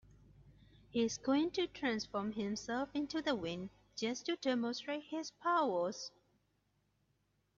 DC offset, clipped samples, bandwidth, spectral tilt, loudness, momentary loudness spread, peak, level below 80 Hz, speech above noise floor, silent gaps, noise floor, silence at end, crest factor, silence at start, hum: under 0.1%; under 0.1%; 7.6 kHz; -3 dB/octave; -38 LUFS; 9 LU; -22 dBFS; -70 dBFS; 42 dB; none; -79 dBFS; 1.5 s; 16 dB; 0.4 s; none